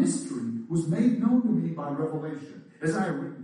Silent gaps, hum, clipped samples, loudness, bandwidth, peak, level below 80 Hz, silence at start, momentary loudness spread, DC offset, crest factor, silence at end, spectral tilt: none; none; under 0.1%; -28 LUFS; 10.5 kHz; -12 dBFS; -68 dBFS; 0 s; 11 LU; under 0.1%; 14 dB; 0 s; -7 dB/octave